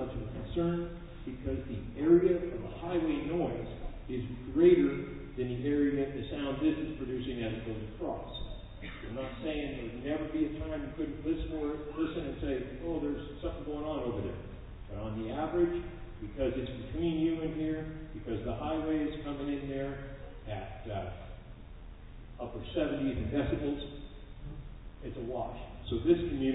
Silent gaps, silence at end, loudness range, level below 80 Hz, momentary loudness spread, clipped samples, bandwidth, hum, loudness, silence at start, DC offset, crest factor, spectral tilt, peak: none; 0 s; 8 LU; -46 dBFS; 16 LU; under 0.1%; 4 kHz; none; -34 LUFS; 0 s; under 0.1%; 20 dB; -6.5 dB/octave; -12 dBFS